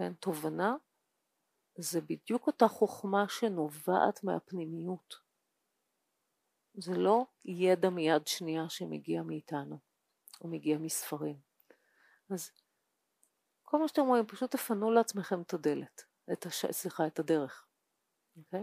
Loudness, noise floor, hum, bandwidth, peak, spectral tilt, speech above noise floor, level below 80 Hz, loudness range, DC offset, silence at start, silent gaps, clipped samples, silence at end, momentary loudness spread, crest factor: -33 LUFS; -82 dBFS; none; 15.5 kHz; -12 dBFS; -5 dB/octave; 49 dB; under -90 dBFS; 7 LU; under 0.1%; 0 s; none; under 0.1%; 0 s; 14 LU; 22 dB